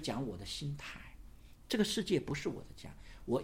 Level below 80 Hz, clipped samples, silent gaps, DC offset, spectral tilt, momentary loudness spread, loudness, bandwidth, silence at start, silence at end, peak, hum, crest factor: -56 dBFS; under 0.1%; none; under 0.1%; -5 dB/octave; 19 LU; -38 LUFS; 16.5 kHz; 0 s; 0 s; -18 dBFS; none; 20 dB